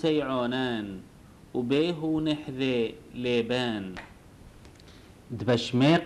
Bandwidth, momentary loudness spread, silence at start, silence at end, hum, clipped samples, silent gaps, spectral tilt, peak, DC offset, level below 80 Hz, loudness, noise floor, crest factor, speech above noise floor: 12.5 kHz; 14 LU; 0 s; 0 s; none; under 0.1%; none; -6.5 dB/octave; -10 dBFS; under 0.1%; -56 dBFS; -28 LUFS; -51 dBFS; 18 dB; 24 dB